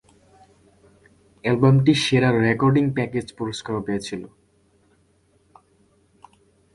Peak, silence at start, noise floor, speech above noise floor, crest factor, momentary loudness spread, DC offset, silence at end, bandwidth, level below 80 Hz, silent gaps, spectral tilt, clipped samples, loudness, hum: -4 dBFS; 1.45 s; -61 dBFS; 42 dB; 20 dB; 13 LU; under 0.1%; 2.5 s; 11.5 kHz; -54 dBFS; none; -6.5 dB/octave; under 0.1%; -21 LUFS; none